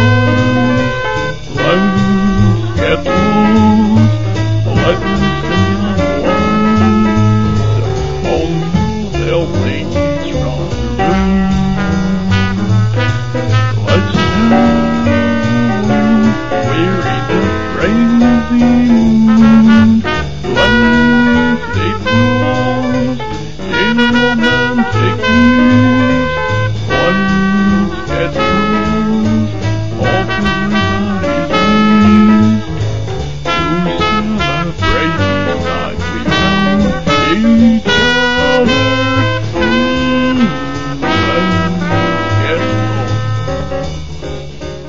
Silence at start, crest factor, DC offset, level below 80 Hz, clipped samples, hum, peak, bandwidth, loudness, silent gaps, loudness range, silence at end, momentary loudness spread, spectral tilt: 0 s; 12 dB; 5%; -28 dBFS; under 0.1%; none; 0 dBFS; 7.6 kHz; -12 LUFS; none; 5 LU; 0 s; 8 LU; -6.5 dB/octave